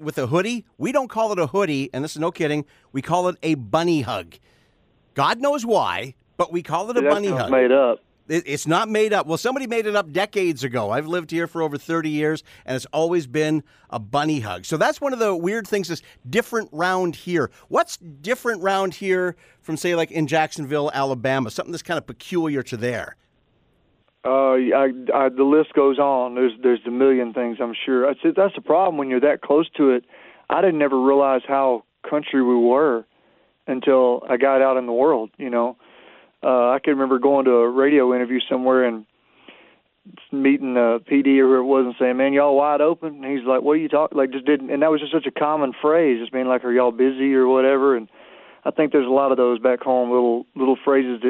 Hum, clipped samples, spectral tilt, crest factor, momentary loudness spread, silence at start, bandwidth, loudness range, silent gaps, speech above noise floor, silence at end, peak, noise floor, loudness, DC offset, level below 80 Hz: none; under 0.1%; -5.5 dB/octave; 16 dB; 10 LU; 0 s; 15 kHz; 5 LU; none; 43 dB; 0 s; -4 dBFS; -63 dBFS; -20 LUFS; under 0.1%; -64 dBFS